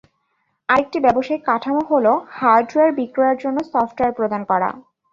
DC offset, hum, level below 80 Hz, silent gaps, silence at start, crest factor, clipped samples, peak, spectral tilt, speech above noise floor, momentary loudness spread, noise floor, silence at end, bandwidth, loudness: under 0.1%; none; -56 dBFS; none; 0.7 s; 16 dB; under 0.1%; -2 dBFS; -6.5 dB/octave; 51 dB; 6 LU; -69 dBFS; 0.35 s; 7.4 kHz; -18 LUFS